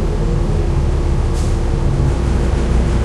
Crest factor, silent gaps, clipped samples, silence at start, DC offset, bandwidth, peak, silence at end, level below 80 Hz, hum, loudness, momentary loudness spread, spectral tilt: 10 dB; none; under 0.1%; 0 s; under 0.1%; 11.5 kHz; -4 dBFS; 0 s; -16 dBFS; none; -18 LUFS; 2 LU; -7.5 dB/octave